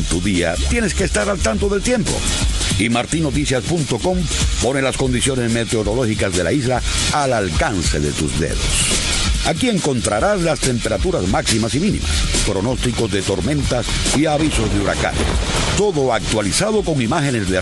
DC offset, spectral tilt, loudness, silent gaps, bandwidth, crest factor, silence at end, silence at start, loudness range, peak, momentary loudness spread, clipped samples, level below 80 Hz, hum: under 0.1%; -4 dB/octave; -18 LUFS; none; 12.5 kHz; 14 dB; 0 s; 0 s; 1 LU; -4 dBFS; 2 LU; under 0.1%; -26 dBFS; none